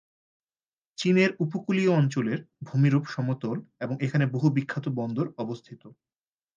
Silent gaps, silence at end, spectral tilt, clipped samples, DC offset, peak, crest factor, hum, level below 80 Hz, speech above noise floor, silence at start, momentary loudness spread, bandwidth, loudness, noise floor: none; 0.65 s; -7.5 dB/octave; under 0.1%; under 0.1%; -10 dBFS; 18 dB; none; -72 dBFS; over 64 dB; 1 s; 12 LU; 7.6 kHz; -27 LUFS; under -90 dBFS